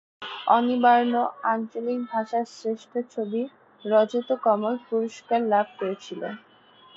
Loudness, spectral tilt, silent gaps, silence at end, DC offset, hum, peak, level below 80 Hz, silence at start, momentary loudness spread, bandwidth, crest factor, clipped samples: -25 LUFS; -5.5 dB/octave; none; 0.6 s; under 0.1%; none; -6 dBFS; -78 dBFS; 0.2 s; 15 LU; 7.8 kHz; 20 dB; under 0.1%